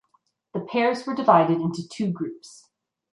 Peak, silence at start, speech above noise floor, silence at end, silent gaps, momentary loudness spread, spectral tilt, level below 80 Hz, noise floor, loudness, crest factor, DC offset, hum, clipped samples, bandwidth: -4 dBFS; 0.55 s; 45 dB; 0.65 s; none; 16 LU; -6.5 dB/octave; -72 dBFS; -68 dBFS; -23 LUFS; 22 dB; under 0.1%; none; under 0.1%; 11.5 kHz